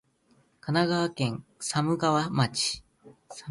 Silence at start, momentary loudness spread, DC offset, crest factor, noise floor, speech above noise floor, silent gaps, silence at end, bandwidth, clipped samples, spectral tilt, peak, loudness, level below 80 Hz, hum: 0.65 s; 15 LU; under 0.1%; 18 dB; -65 dBFS; 39 dB; none; 0 s; 11.5 kHz; under 0.1%; -4.5 dB/octave; -10 dBFS; -27 LUFS; -62 dBFS; none